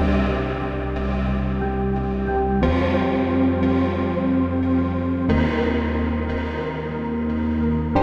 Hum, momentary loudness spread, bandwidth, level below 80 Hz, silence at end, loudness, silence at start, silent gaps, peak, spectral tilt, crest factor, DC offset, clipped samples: none; 6 LU; 6.6 kHz; -30 dBFS; 0 s; -22 LUFS; 0 s; none; -6 dBFS; -9 dB/octave; 16 dB; under 0.1%; under 0.1%